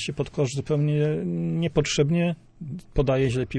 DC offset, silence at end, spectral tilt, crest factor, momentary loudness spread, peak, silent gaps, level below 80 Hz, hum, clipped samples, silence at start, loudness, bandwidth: under 0.1%; 0 s; -6 dB/octave; 16 dB; 8 LU; -8 dBFS; none; -42 dBFS; none; under 0.1%; 0 s; -25 LUFS; 10 kHz